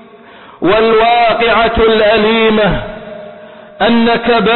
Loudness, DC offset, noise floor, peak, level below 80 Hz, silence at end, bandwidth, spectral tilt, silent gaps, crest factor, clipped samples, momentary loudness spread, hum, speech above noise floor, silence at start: -10 LUFS; under 0.1%; -37 dBFS; -2 dBFS; -32 dBFS; 0 s; 4.3 kHz; -10.5 dB/octave; none; 10 dB; under 0.1%; 14 LU; none; 27 dB; 0.6 s